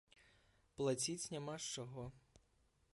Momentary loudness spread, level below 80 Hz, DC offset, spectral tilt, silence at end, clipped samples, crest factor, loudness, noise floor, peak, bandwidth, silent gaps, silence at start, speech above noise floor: 14 LU; -74 dBFS; under 0.1%; -4 dB/octave; 0.75 s; under 0.1%; 18 dB; -43 LUFS; -77 dBFS; -28 dBFS; 11.5 kHz; none; 0.8 s; 33 dB